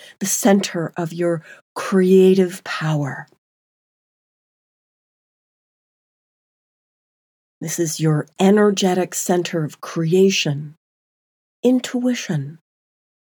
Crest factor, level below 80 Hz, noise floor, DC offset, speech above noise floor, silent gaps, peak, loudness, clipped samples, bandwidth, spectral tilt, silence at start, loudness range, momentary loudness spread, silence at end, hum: 18 dB; -78 dBFS; under -90 dBFS; under 0.1%; over 72 dB; 1.62-1.76 s, 3.38-7.61 s, 10.77-11.63 s; -4 dBFS; -19 LUFS; under 0.1%; over 20 kHz; -5 dB/octave; 0.2 s; 11 LU; 13 LU; 0.75 s; none